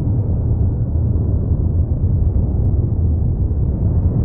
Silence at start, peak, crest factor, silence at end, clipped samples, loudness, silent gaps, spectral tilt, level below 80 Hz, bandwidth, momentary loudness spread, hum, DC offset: 0 s; -6 dBFS; 10 dB; 0 s; under 0.1%; -18 LUFS; none; -16 dB/octave; -20 dBFS; 1.6 kHz; 1 LU; none; under 0.1%